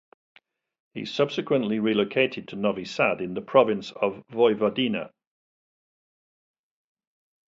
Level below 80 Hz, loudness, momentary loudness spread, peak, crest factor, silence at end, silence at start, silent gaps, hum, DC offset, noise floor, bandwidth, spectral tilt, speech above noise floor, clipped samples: -68 dBFS; -25 LUFS; 10 LU; -6 dBFS; 22 dB; 2.4 s; 0.95 s; none; none; under 0.1%; under -90 dBFS; 7.8 kHz; -6 dB/octave; over 66 dB; under 0.1%